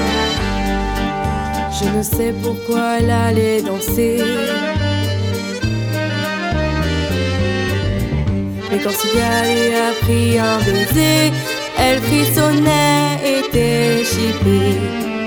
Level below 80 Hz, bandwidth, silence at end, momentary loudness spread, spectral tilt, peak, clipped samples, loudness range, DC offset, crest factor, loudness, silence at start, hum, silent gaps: -30 dBFS; over 20 kHz; 0 s; 7 LU; -5 dB/octave; 0 dBFS; under 0.1%; 4 LU; under 0.1%; 16 dB; -16 LUFS; 0 s; none; none